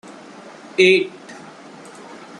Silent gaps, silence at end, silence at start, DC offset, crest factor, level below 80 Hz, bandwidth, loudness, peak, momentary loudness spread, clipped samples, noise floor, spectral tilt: none; 0.25 s; 0.8 s; under 0.1%; 20 dB; -68 dBFS; 10.5 kHz; -16 LUFS; -2 dBFS; 26 LU; under 0.1%; -40 dBFS; -4 dB/octave